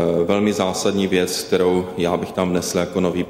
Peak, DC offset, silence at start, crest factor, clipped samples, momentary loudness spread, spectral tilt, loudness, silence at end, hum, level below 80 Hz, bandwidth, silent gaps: -6 dBFS; under 0.1%; 0 s; 14 dB; under 0.1%; 3 LU; -5 dB/octave; -20 LUFS; 0 s; none; -50 dBFS; 16.5 kHz; none